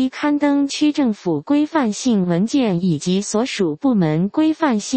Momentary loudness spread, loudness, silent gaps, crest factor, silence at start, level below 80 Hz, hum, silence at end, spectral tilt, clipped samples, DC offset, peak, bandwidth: 3 LU; -18 LUFS; none; 14 dB; 0 s; -58 dBFS; none; 0 s; -5.5 dB/octave; under 0.1%; under 0.1%; -2 dBFS; 8.8 kHz